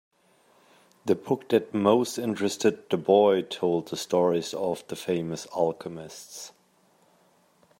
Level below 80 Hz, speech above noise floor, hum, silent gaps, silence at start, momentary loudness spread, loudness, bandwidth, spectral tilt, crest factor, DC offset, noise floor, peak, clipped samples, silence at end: -72 dBFS; 38 dB; none; none; 1.05 s; 17 LU; -26 LUFS; 16 kHz; -5 dB/octave; 20 dB; under 0.1%; -64 dBFS; -6 dBFS; under 0.1%; 1.3 s